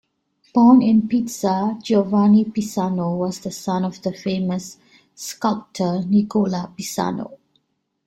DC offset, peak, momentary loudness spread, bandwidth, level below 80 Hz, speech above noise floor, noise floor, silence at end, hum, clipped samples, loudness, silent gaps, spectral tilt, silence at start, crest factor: under 0.1%; -2 dBFS; 13 LU; 14.5 kHz; -60 dBFS; 52 dB; -71 dBFS; 0.7 s; none; under 0.1%; -20 LUFS; none; -6.5 dB/octave; 0.55 s; 16 dB